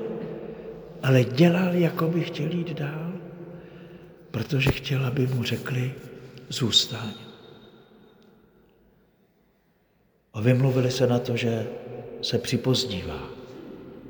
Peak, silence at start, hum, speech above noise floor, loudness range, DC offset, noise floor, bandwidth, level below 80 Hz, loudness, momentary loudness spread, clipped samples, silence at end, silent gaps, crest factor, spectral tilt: -6 dBFS; 0 s; none; 41 dB; 4 LU; under 0.1%; -65 dBFS; over 20 kHz; -52 dBFS; -25 LUFS; 21 LU; under 0.1%; 0 s; none; 22 dB; -5.5 dB/octave